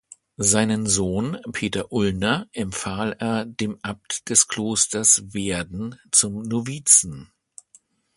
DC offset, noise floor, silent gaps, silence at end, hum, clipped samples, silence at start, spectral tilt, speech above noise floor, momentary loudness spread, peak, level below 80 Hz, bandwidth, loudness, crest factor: under 0.1%; -57 dBFS; none; 0.9 s; none; under 0.1%; 0.4 s; -3 dB/octave; 35 dB; 13 LU; 0 dBFS; -50 dBFS; 12 kHz; -20 LUFS; 24 dB